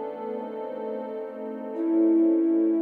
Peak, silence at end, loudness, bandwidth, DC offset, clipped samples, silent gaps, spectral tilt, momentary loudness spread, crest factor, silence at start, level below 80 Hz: -14 dBFS; 0 s; -26 LUFS; 3.3 kHz; under 0.1%; under 0.1%; none; -9.5 dB/octave; 14 LU; 10 dB; 0 s; -78 dBFS